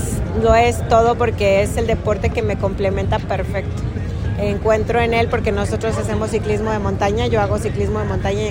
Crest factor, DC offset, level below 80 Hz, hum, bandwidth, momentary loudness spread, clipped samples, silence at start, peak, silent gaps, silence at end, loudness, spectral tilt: 16 dB; under 0.1%; -28 dBFS; none; 16.5 kHz; 7 LU; under 0.1%; 0 s; -2 dBFS; none; 0 s; -18 LUFS; -6.5 dB/octave